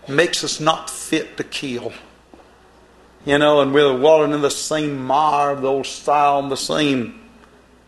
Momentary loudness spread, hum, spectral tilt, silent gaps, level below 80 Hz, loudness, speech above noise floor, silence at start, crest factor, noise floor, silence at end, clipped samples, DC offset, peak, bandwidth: 12 LU; none; -4 dB/octave; none; -54 dBFS; -18 LUFS; 31 dB; 0.05 s; 18 dB; -49 dBFS; 0.7 s; under 0.1%; under 0.1%; 0 dBFS; 12.5 kHz